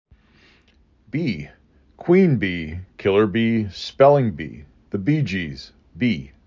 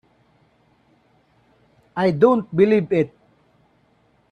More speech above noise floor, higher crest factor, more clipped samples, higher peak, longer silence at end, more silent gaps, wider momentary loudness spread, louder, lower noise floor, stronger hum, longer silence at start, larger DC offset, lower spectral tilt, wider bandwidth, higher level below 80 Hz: second, 38 dB vs 43 dB; about the same, 20 dB vs 20 dB; neither; about the same, -2 dBFS vs -2 dBFS; second, 0.2 s vs 1.25 s; neither; first, 18 LU vs 9 LU; about the same, -20 LUFS vs -19 LUFS; second, -57 dBFS vs -61 dBFS; neither; second, 1.15 s vs 1.95 s; neither; about the same, -8 dB/octave vs -9 dB/octave; second, 7.6 kHz vs 9 kHz; first, -46 dBFS vs -62 dBFS